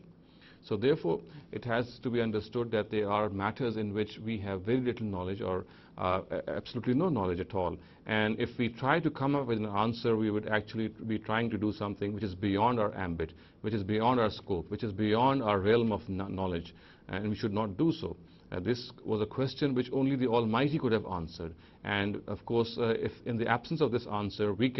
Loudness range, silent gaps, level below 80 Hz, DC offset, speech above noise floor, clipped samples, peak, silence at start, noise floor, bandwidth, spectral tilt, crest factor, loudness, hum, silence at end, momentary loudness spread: 3 LU; none; -58 dBFS; under 0.1%; 26 dB; under 0.1%; -12 dBFS; 0.05 s; -57 dBFS; 6 kHz; -8.5 dB/octave; 20 dB; -32 LUFS; none; 0 s; 9 LU